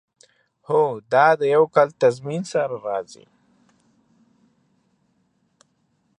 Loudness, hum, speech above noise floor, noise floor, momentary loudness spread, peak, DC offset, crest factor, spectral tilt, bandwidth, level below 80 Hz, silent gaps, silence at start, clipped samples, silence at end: -20 LUFS; none; 48 dB; -67 dBFS; 12 LU; -4 dBFS; under 0.1%; 20 dB; -5.5 dB/octave; 10 kHz; -74 dBFS; none; 0.7 s; under 0.1%; 3.15 s